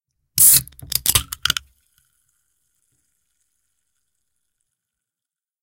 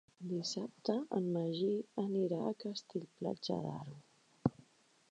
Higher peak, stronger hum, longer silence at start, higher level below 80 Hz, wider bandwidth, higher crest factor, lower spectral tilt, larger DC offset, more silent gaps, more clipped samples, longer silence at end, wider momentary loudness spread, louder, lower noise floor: first, 0 dBFS vs -18 dBFS; neither; first, 0.35 s vs 0.2 s; first, -46 dBFS vs -74 dBFS; first, 17 kHz vs 9.8 kHz; about the same, 24 dB vs 22 dB; second, 0.5 dB/octave vs -6.5 dB/octave; neither; neither; neither; first, 4.1 s vs 0.6 s; first, 14 LU vs 8 LU; first, -15 LUFS vs -39 LUFS; first, -89 dBFS vs -69 dBFS